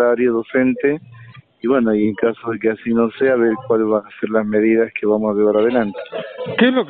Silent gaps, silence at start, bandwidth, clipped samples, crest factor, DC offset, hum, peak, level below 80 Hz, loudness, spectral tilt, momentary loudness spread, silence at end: none; 0 s; 4.3 kHz; under 0.1%; 16 dB; under 0.1%; none; -2 dBFS; -56 dBFS; -17 LUFS; -5 dB/octave; 8 LU; 0 s